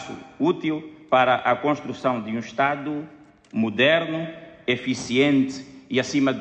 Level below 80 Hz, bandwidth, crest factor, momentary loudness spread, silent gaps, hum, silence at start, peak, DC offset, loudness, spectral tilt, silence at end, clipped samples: -64 dBFS; 8.8 kHz; 16 dB; 13 LU; none; none; 0 s; -6 dBFS; under 0.1%; -23 LUFS; -5 dB/octave; 0 s; under 0.1%